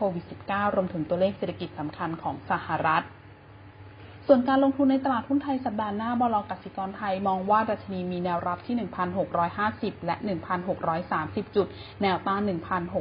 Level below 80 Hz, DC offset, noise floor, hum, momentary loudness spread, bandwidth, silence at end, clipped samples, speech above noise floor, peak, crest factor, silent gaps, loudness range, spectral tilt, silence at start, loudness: -56 dBFS; under 0.1%; -48 dBFS; none; 10 LU; 5.2 kHz; 0 s; under 0.1%; 22 dB; -6 dBFS; 20 dB; none; 3 LU; -11 dB/octave; 0 s; -27 LUFS